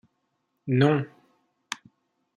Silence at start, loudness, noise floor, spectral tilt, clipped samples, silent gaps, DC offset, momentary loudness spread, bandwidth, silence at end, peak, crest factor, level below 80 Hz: 0.65 s; -24 LUFS; -76 dBFS; -7 dB/octave; under 0.1%; none; under 0.1%; 18 LU; 11 kHz; 0.6 s; -8 dBFS; 22 dB; -70 dBFS